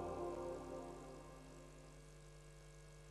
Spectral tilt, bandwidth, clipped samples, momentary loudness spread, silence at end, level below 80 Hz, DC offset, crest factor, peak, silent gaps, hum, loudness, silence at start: -6 dB/octave; 13 kHz; under 0.1%; 14 LU; 0 s; -62 dBFS; under 0.1%; 16 dB; -36 dBFS; none; none; -53 LUFS; 0 s